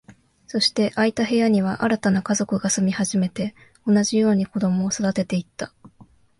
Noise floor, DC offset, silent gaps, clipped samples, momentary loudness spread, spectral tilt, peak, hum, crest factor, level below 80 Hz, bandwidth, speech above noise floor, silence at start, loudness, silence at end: -52 dBFS; under 0.1%; none; under 0.1%; 11 LU; -4.5 dB/octave; -6 dBFS; none; 16 dB; -58 dBFS; 11.5 kHz; 31 dB; 0.1 s; -21 LUFS; 0.35 s